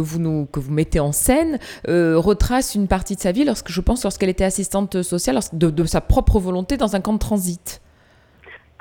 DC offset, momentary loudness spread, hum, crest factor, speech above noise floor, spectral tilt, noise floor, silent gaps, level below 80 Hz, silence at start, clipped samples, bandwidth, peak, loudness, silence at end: under 0.1%; 6 LU; none; 18 dB; 34 dB; -5.5 dB/octave; -53 dBFS; none; -28 dBFS; 0 s; under 0.1%; 19.5 kHz; -2 dBFS; -20 LUFS; 0.25 s